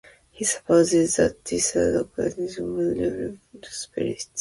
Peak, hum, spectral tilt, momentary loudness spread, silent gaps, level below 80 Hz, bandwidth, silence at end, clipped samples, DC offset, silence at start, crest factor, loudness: -6 dBFS; none; -4 dB/octave; 13 LU; none; -50 dBFS; 11.5 kHz; 0 s; under 0.1%; under 0.1%; 0.35 s; 18 dB; -23 LUFS